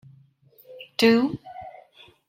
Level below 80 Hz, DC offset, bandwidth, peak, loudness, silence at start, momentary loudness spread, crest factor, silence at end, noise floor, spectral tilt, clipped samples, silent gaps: -66 dBFS; under 0.1%; 15.5 kHz; -6 dBFS; -22 LUFS; 0.7 s; 25 LU; 22 dB; 0.6 s; -57 dBFS; -5 dB/octave; under 0.1%; none